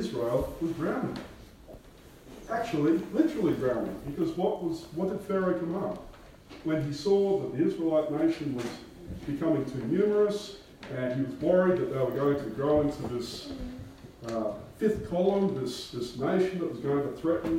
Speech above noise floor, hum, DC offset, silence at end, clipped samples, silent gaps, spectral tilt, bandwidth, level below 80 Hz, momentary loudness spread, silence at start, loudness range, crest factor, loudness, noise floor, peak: 23 dB; none; under 0.1%; 0 s; under 0.1%; none; -7 dB/octave; 16 kHz; -54 dBFS; 14 LU; 0 s; 3 LU; 18 dB; -29 LUFS; -52 dBFS; -12 dBFS